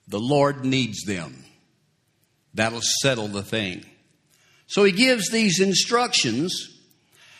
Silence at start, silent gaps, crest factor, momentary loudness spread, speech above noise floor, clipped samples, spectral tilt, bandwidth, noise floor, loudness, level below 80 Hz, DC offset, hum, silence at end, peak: 0.1 s; none; 20 dB; 12 LU; 45 dB; under 0.1%; -3.5 dB/octave; 15 kHz; -67 dBFS; -21 LUFS; -62 dBFS; under 0.1%; none; 0.75 s; -4 dBFS